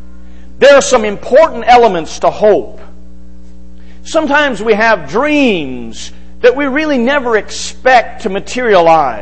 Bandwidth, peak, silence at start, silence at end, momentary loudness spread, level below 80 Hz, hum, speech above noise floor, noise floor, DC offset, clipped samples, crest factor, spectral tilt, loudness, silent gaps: 8.8 kHz; 0 dBFS; 0.6 s; 0 s; 12 LU; -38 dBFS; none; 25 dB; -36 dBFS; 6%; 0.3%; 12 dB; -3.5 dB/octave; -10 LUFS; none